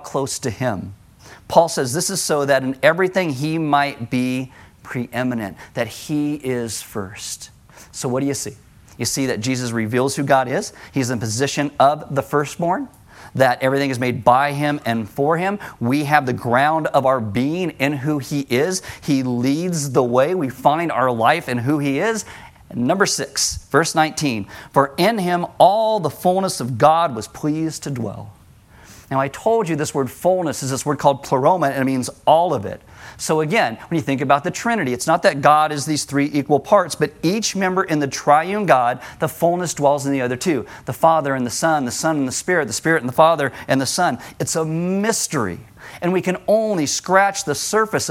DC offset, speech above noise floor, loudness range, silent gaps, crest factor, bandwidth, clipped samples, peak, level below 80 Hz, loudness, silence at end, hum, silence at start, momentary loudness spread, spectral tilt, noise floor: under 0.1%; 28 dB; 5 LU; none; 20 dB; 16.5 kHz; under 0.1%; 0 dBFS; -54 dBFS; -19 LUFS; 0 s; none; 0 s; 10 LU; -4.5 dB/octave; -47 dBFS